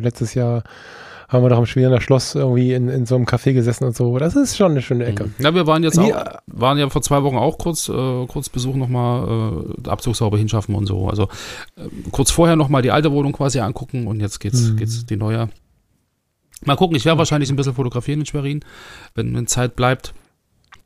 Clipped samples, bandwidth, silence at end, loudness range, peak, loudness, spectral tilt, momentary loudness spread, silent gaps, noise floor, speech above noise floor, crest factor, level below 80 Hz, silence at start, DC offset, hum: under 0.1%; 15.5 kHz; 0.65 s; 4 LU; 0 dBFS; -18 LUFS; -6 dB/octave; 11 LU; none; -68 dBFS; 50 dB; 16 dB; -38 dBFS; 0 s; under 0.1%; none